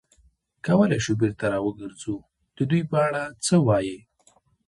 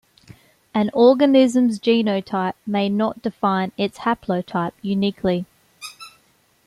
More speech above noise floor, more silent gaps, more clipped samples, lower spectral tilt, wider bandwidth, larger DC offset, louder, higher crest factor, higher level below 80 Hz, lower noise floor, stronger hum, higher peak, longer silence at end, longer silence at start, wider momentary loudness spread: about the same, 39 dB vs 41 dB; neither; neither; about the same, -6 dB/octave vs -6.5 dB/octave; about the same, 11.5 kHz vs 12.5 kHz; neither; second, -24 LUFS vs -20 LUFS; about the same, 18 dB vs 18 dB; about the same, -54 dBFS vs -58 dBFS; about the same, -62 dBFS vs -60 dBFS; neither; about the same, -6 dBFS vs -4 dBFS; about the same, 0.7 s vs 0.6 s; about the same, 0.65 s vs 0.75 s; about the same, 14 LU vs 12 LU